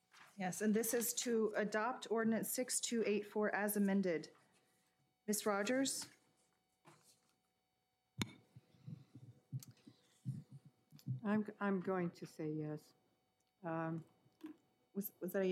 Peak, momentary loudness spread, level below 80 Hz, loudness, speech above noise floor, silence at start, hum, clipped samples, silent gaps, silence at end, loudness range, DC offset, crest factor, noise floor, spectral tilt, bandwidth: -20 dBFS; 19 LU; -88 dBFS; -40 LUFS; 46 dB; 0.15 s; none; under 0.1%; none; 0 s; 15 LU; under 0.1%; 22 dB; -85 dBFS; -4.5 dB/octave; 16 kHz